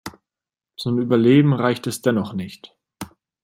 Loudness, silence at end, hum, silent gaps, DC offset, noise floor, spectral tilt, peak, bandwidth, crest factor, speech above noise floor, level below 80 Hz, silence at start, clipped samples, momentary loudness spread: -19 LUFS; 0.4 s; none; none; under 0.1%; -89 dBFS; -6.5 dB/octave; -2 dBFS; 16.5 kHz; 18 dB; 71 dB; -62 dBFS; 0.05 s; under 0.1%; 23 LU